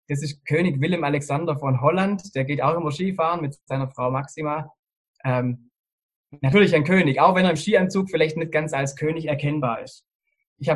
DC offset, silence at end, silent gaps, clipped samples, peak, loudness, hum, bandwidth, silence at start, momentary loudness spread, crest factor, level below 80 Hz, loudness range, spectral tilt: under 0.1%; 0 s; 4.79-4.83 s, 4.97-5.14 s, 5.79-5.84 s, 5.92-6.09 s, 6.16-6.24 s, 10.15-10.19 s, 10.47-10.56 s; under 0.1%; -2 dBFS; -22 LUFS; none; 12 kHz; 0.1 s; 11 LU; 20 dB; -56 dBFS; 6 LU; -6.5 dB/octave